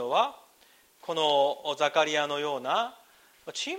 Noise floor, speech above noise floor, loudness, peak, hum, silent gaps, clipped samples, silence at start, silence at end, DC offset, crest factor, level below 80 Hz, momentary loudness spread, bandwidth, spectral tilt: -61 dBFS; 33 dB; -28 LUFS; -10 dBFS; none; none; under 0.1%; 0 s; 0 s; under 0.1%; 18 dB; -80 dBFS; 13 LU; 16 kHz; -2 dB/octave